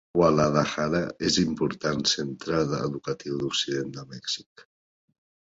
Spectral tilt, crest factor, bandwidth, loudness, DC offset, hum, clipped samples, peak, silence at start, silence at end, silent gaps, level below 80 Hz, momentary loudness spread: -4.5 dB/octave; 20 dB; 8 kHz; -26 LUFS; under 0.1%; none; under 0.1%; -8 dBFS; 0.15 s; 0.9 s; 4.46-4.56 s; -54 dBFS; 10 LU